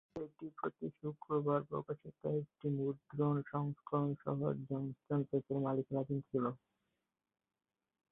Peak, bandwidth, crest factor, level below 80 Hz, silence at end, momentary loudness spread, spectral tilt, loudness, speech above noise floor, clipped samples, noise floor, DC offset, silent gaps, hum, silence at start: -22 dBFS; 3.9 kHz; 18 dB; -76 dBFS; 1.55 s; 8 LU; -8 dB/octave; -40 LUFS; 50 dB; under 0.1%; -88 dBFS; under 0.1%; none; none; 0.15 s